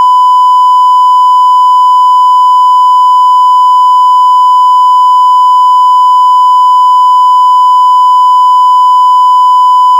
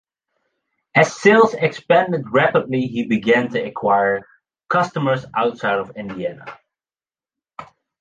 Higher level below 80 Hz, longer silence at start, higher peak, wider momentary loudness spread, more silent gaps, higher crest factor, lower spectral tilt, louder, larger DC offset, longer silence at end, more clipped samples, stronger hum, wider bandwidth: second, under -90 dBFS vs -60 dBFS; second, 0 s vs 0.95 s; about the same, 0 dBFS vs 0 dBFS; second, 0 LU vs 13 LU; neither; second, 4 dB vs 20 dB; second, 6.5 dB/octave vs -6 dB/octave; first, -4 LUFS vs -18 LUFS; neither; second, 0 s vs 0.35 s; first, 4% vs under 0.1%; neither; first, 11.5 kHz vs 9.4 kHz